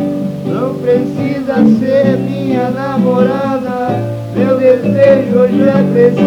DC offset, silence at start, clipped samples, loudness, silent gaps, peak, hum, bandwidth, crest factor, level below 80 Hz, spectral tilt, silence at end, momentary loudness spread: under 0.1%; 0 s; under 0.1%; -12 LUFS; none; 0 dBFS; none; 12.5 kHz; 12 dB; -48 dBFS; -8.5 dB/octave; 0 s; 8 LU